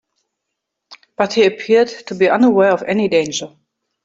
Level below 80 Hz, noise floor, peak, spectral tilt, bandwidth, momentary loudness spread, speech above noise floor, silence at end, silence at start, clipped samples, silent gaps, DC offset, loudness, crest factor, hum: -62 dBFS; -78 dBFS; 0 dBFS; -4.5 dB/octave; 7.8 kHz; 12 LU; 63 dB; 0.55 s; 0.9 s; under 0.1%; none; under 0.1%; -15 LUFS; 16 dB; none